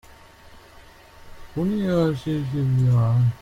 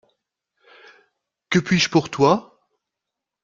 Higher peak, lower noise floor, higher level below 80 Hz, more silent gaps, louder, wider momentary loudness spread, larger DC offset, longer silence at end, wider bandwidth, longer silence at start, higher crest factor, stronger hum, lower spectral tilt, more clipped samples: second, -8 dBFS vs -2 dBFS; second, -48 dBFS vs -84 dBFS; first, -46 dBFS vs -58 dBFS; neither; second, -22 LUFS vs -19 LUFS; first, 8 LU vs 5 LU; neither; second, 0.05 s vs 1.05 s; about the same, 7.6 kHz vs 7.6 kHz; second, 0.55 s vs 1.5 s; second, 14 dB vs 20 dB; neither; first, -9 dB/octave vs -5 dB/octave; neither